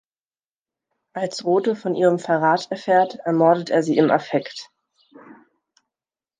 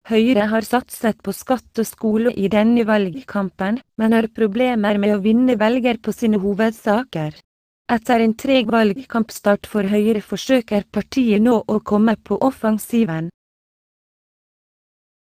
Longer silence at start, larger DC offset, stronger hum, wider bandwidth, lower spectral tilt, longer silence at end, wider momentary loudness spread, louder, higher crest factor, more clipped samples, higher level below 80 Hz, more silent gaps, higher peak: first, 1.15 s vs 0.05 s; neither; neither; second, 9.6 kHz vs 15.5 kHz; about the same, -6 dB/octave vs -6 dB/octave; second, 1.75 s vs 2.05 s; first, 11 LU vs 7 LU; about the same, -20 LUFS vs -18 LUFS; about the same, 20 dB vs 16 dB; neither; second, -74 dBFS vs -52 dBFS; second, none vs 7.44-7.85 s; about the same, -2 dBFS vs -2 dBFS